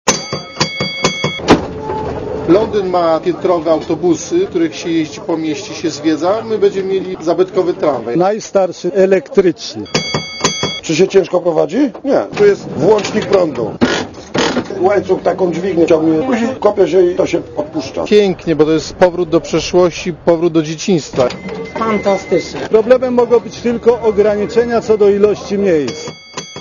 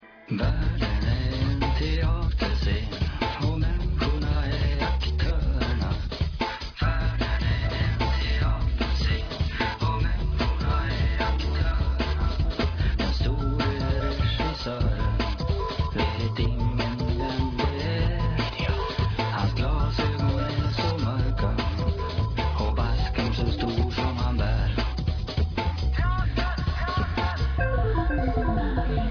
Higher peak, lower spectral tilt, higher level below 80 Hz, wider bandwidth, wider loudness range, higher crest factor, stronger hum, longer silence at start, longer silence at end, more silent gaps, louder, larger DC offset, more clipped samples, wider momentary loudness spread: first, 0 dBFS vs -12 dBFS; second, -5 dB/octave vs -7 dB/octave; second, -42 dBFS vs -28 dBFS; first, 8.4 kHz vs 5.4 kHz; about the same, 2 LU vs 1 LU; about the same, 14 dB vs 12 dB; neither; about the same, 0.05 s vs 0 s; about the same, 0 s vs 0 s; neither; first, -14 LUFS vs -27 LUFS; neither; first, 0.1% vs under 0.1%; first, 8 LU vs 2 LU